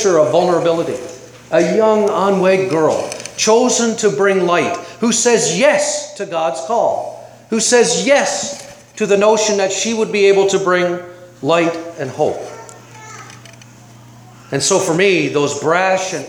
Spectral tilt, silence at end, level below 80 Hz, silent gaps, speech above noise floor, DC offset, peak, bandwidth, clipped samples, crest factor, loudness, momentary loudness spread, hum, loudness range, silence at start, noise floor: -3.5 dB/octave; 0 s; -62 dBFS; none; 26 dB; under 0.1%; 0 dBFS; 16 kHz; under 0.1%; 16 dB; -15 LUFS; 13 LU; none; 6 LU; 0 s; -40 dBFS